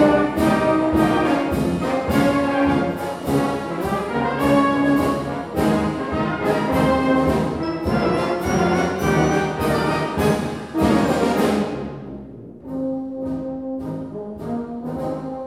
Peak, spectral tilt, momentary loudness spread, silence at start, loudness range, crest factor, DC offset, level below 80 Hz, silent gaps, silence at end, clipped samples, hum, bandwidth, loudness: -4 dBFS; -6.5 dB/octave; 11 LU; 0 s; 6 LU; 16 dB; 0.1%; -40 dBFS; none; 0 s; under 0.1%; none; 16 kHz; -20 LUFS